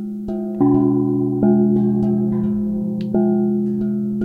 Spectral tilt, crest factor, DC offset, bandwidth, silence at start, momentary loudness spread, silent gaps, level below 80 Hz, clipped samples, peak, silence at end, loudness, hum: -12 dB/octave; 14 dB; under 0.1%; 2.9 kHz; 0 s; 7 LU; none; -46 dBFS; under 0.1%; -4 dBFS; 0 s; -18 LUFS; none